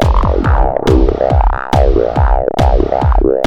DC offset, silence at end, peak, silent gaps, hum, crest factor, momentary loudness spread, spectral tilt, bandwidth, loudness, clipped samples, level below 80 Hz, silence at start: under 0.1%; 0 s; 0 dBFS; none; none; 10 dB; 2 LU; -8 dB/octave; 8.2 kHz; -13 LUFS; under 0.1%; -14 dBFS; 0 s